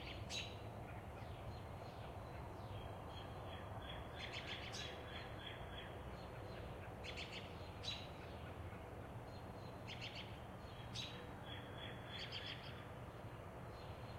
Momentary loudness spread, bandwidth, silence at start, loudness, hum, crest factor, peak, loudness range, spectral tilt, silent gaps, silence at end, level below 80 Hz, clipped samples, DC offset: 6 LU; 16 kHz; 0 s; -51 LUFS; none; 18 dB; -32 dBFS; 2 LU; -4.5 dB/octave; none; 0 s; -60 dBFS; under 0.1%; under 0.1%